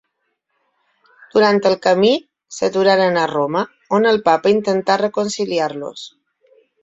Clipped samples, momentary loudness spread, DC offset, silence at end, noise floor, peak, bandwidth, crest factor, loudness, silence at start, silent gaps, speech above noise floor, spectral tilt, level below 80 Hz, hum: under 0.1%; 9 LU; under 0.1%; 0.75 s; -72 dBFS; 0 dBFS; 8 kHz; 16 dB; -16 LUFS; 1.35 s; none; 56 dB; -4.5 dB/octave; -62 dBFS; none